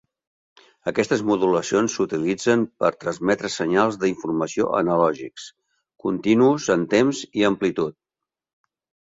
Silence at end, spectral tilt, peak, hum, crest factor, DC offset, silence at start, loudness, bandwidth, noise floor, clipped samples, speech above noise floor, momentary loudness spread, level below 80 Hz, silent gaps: 1.2 s; -5 dB/octave; -4 dBFS; none; 18 dB; under 0.1%; 0.85 s; -21 LUFS; 7.8 kHz; -87 dBFS; under 0.1%; 66 dB; 9 LU; -60 dBFS; none